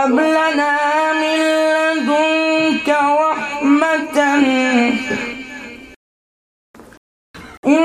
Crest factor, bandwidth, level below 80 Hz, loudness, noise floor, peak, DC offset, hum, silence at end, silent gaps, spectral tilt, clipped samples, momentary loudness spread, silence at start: 16 dB; 13 kHz; -56 dBFS; -15 LUFS; under -90 dBFS; -2 dBFS; under 0.1%; none; 0 s; 5.96-6.74 s, 6.97-7.34 s, 7.57-7.63 s; -3.5 dB/octave; under 0.1%; 9 LU; 0 s